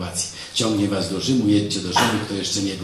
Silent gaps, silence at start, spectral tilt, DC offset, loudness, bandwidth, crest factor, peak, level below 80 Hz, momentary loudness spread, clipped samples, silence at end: none; 0 s; -4 dB/octave; under 0.1%; -21 LUFS; 15.5 kHz; 18 dB; -4 dBFS; -54 dBFS; 6 LU; under 0.1%; 0 s